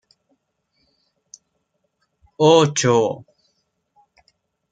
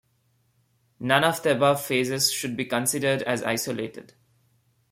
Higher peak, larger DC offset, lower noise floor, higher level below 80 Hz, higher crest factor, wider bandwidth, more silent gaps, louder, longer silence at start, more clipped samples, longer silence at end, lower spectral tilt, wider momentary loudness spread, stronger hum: first, 0 dBFS vs -6 dBFS; neither; first, -72 dBFS vs -68 dBFS; about the same, -64 dBFS vs -66 dBFS; about the same, 22 dB vs 22 dB; second, 9.4 kHz vs 16.5 kHz; neither; first, -16 LUFS vs -24 LUFS; first, 2.4 s vs 1 s; neither; first, 1.55 s vs 0.9 s; about the same, -4.5 dB/octave vs -3.5 dB/octave; about the same, 11 LU vs 9 LU; neither